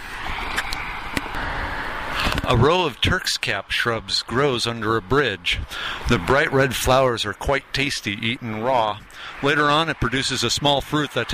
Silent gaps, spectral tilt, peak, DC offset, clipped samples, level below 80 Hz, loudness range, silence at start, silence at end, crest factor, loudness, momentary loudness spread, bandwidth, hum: none; -4 dB/octave; -6 dBFS; under 0.1%; under 0.1%; -36 dBFS; 2 LU; 0 s; 0 s; 16 dB; -21 LUFS; 9 LU; 15.5 kHz; none